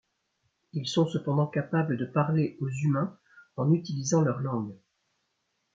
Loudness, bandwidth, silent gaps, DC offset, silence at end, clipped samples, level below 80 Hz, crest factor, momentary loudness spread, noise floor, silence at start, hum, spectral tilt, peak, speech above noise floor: -28 LUFS; 7.6 kHz; none; under 0.1%; 1 s; under 0.1%; -70 dBFS; 18 dB; 9 LU; -78 dBFS; 0.75 s; none; -6.5 dB/octave; -10 dBFS; 50 dB